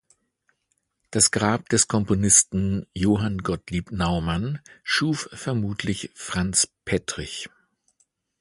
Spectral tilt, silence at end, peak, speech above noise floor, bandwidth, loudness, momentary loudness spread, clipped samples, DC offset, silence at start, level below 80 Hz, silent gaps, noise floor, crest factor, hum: -3.5 dB/octave; 0.95 s; -2 dBFS; 50 dB; 11.5 kHz; -23 LUFS; 14 LU; under 0.1%; under 0.1%; 1.1 s; -44 dBFS; none; -74 dBFS; 22 dB; none